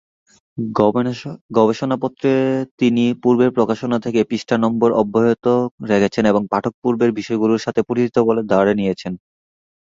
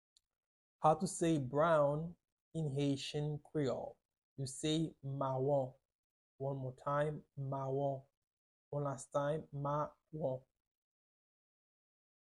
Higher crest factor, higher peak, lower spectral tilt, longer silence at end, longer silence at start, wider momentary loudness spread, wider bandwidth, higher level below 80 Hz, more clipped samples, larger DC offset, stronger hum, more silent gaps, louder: second, 16 dB vs 22 dB; first, -2 dBFS vs -18 dBFS; about the same, -7 dB/octave vs -6 dB/octave; second, 0.7 s vs 1.85 s; second, 0.55 s vs 0.8 s; second, 6 LU vs 12 LU; second, 7.6 kHz vs 11.5 kHz; first, -54 dBFS vs -72 dBFS; neither; neither; neither; second, 1.41-1.49 s, 2.71-2.78 s, 5.71-5.78 s, 6.74-6.82 s vs 2.32-2.51 s, 4.05-4.09 s, 4.18-4.36 s, 5.85-5.89 s, 5.95-6.39 s, 8.17-8.22 s, 8.33-8.71 s; first, -18 LUFS vs -38 LUFS